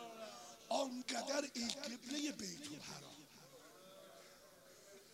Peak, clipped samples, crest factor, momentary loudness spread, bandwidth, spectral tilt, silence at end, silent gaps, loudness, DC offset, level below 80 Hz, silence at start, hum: -20 dBFS; under 0.1%; 28 dB; 20 LU; 16 kHz; -2.5 dB/octave; 0 s; none; -44 LUFS; under 0.1%; -84 dBFS; 0 s; none